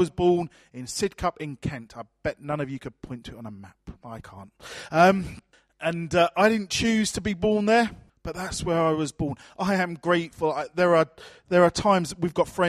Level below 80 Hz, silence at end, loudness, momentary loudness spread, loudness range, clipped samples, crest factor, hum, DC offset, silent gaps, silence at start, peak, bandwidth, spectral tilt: -50 dBFS; 0 s; -24 LUFS; 20 LU; 9 LU; under 0.1%; 20 dB; none; under 0.1%; none; 0 s; -6 dBFS; 14.5 kHz; -5 dB/octave